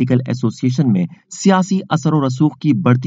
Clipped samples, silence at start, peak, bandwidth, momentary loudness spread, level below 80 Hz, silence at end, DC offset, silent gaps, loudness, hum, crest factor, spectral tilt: under 0.1%; 0 s; 0 dBFS; 8 kHz; 4 LU; -56 dBFS; 0 s; under 0.1%; none; -16 LUFS; none; 14 dB; -7 dB/octave